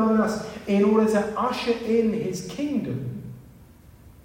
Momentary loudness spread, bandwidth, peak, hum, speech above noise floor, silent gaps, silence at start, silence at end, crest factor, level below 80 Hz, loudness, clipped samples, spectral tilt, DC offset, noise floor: 12 LU; 16 kHz; -8 dBFS; none; 26 dB; none; 0 s; 0.15 s; 16 dB; -54 dBFS; -24 LUFS; under 0.1%; -6.5 dB/octave; under 0.1%; -49 dBFS